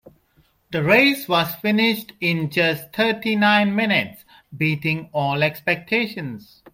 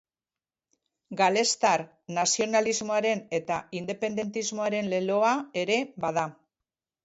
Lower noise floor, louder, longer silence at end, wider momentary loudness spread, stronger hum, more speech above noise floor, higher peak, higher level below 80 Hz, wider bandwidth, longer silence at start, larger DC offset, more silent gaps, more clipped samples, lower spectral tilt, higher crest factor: second, -61 dBFS vs under -90 dBFS; first, -20 LUFS vs -27 LUFS; second, 0.35 s vs 0.7 s; about the same, 9 LU vs 8 LU; neither; second, 40 dB vs over 63 dB; first, -2 dBFS vs -10 dBFS; first, -60 dBFS vs -72 dBFS; first, 16.5 kHz vs 8.2 kHz; second, 0.7 s vs 1.1 s; neither; neither; neither; first, -5.5 dB/octave vs -3 dB/octave; about the same, 18 dB vs 18 dB